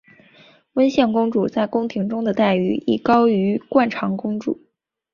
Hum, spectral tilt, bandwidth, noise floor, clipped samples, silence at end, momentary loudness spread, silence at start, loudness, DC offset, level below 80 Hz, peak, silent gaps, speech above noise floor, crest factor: none; -7.5 dB/octave; 7 kHz; -51 dBFS; under 0.1%; 0.6 s; 9 LU; 0.75 s; -19 LUFS; under 0.1%; -58 dBFS; -2 dBFS; none; 33 dB; 18 dB